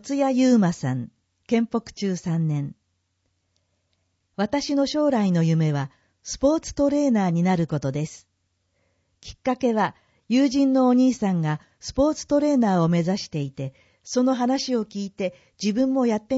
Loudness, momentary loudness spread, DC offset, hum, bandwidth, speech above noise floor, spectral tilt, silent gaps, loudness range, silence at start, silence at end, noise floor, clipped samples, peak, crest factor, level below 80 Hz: -23 LUFS; 12 LU; under 0.1%; none; 8 kHz; 51 dB; -6.5 dB/octave; none; 6 LU; 0.05 s; 0 s; -73 dBFS; under 0.1%; -8 dBFS; 16 dB; -52 dBFS